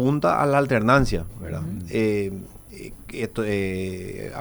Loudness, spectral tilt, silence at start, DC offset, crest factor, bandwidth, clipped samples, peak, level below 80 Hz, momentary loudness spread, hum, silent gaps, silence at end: -23 LUFS; -7 dB/octave; 0 s; under 0.1%; 20 dB; over 20 kHz; under 0.1%; -4 dBFS; -40 dBFS; 19 LU; none; none; 0 s